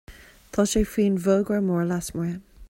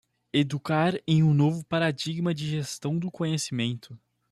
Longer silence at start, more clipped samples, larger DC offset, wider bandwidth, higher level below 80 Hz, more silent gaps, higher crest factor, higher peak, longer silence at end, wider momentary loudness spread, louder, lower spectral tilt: second, 0.1 s vs 0.35 s; neither; neither; first, 16.5 kHz vs 12.5 kHz; first, -42 dBFS vs -64 dBFS; neither; about the same, 16 dB vs 16 dB; first, -8 dBFS vs -12 dBFS; second, 0.05 s vs 0.35 s; about the same, 9 LU vs 8 LU; first, -24 LUFS vs -27 LUFS; about the same, -6 dB/octave vs -6 dB/octave